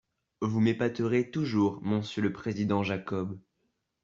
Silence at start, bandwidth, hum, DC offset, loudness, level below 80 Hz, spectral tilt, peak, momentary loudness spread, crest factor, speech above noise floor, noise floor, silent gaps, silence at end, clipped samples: 0.4 s; 7.6 kHz; none; under 0.1%; -30 LUFS; -66 dBFS; -7.5 dB/octave; -14 dBFS; 8 LU; 16 dB; 49 dB; -78 dBFS; none; 0.65 s; under 0.1%